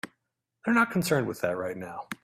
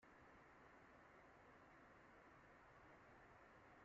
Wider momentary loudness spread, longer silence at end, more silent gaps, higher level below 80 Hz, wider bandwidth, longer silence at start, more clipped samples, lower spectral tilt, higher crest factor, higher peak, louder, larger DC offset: first, 14 LU vs 1 LU; about the same, 0.1 s vs 0 s; neither; first, -66 dBFS vs -82 dBFS; first, 16 kHz vs 7.4 kHz; about the same, 0.05 s vs 0 s; neither; first, -5.5 dB/octave vs -4 dB/octave; first, 20 dB vs 12 dB; first, -8 dBFS vs -56 dBFS; first, -27 LUFS vs -67 LUFS; neither